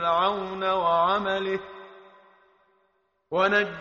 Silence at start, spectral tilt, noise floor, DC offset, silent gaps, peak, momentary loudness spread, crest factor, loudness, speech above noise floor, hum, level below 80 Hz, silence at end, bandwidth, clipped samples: 0 s; -1.5 dB/octave; -71 dBFS; under 0.1%; none; -10 dBFS; 11 LU; 16 dB; -25 LUFS; 46 dB; none; -62 dBFS; 0 s; 7.2 kHz; under 0.1%